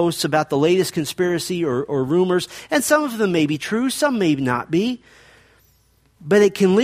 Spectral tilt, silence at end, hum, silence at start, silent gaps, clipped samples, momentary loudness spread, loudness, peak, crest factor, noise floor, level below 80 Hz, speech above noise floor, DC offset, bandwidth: -5 dB/octave; 0 s; none; 0 s; none; under 0.1%; 6 LU; -19 LUFS; -2 dBFS; 18 dB; -59 dBFS; -58 dBFS; 40 dB; under 0.1%; 15.5 kHz